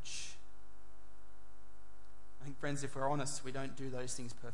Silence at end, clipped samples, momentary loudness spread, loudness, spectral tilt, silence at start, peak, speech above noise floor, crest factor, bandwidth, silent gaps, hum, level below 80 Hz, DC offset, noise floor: 0 s; under 0.1%; 26 LU; -42 LUFS; -4 dB/octave; 0 s; -24 dBFS; 21 dB; 22 dB; 11.5 kHz; none; none; -64 dBFS; 2%; -62 dBFS